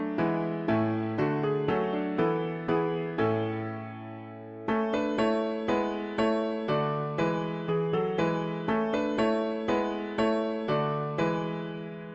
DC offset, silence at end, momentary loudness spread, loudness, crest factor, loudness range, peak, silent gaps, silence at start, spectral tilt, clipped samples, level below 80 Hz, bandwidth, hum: under 0.1%; 0 s; 7 LU; -29 LUFS; 14 dB; 2 LU; -14 dBFS; none; 0 s; -7.5 dB/octave; under 0.1%; -60 dBFS; 7.8 kHz; none